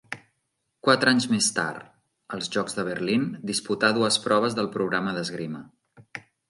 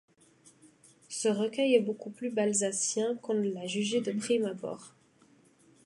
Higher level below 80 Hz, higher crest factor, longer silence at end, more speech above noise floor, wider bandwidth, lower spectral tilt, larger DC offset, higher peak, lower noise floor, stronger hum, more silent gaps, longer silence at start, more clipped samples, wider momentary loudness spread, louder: first, -68 dBFS vs -82 dBFS; about the same, 22 dB vs 20 dB; second, 0.3 s vs 0.95 s; first, 52 dB vs 33 dB; about the same, 11.5 kHz vs 11.5 kHz; about the same, -3.5 dB/octave vs -3.5 dB/octave; neither; first, -4 dBFS vs -12 dBFS; first, -77 dBFS vs -63 dBFS; neither; neither; second, 0.1 s vs 1.1 s; neither; first, 19 LU vs 11 LU; first, -24 LUFS vs -30 LUFS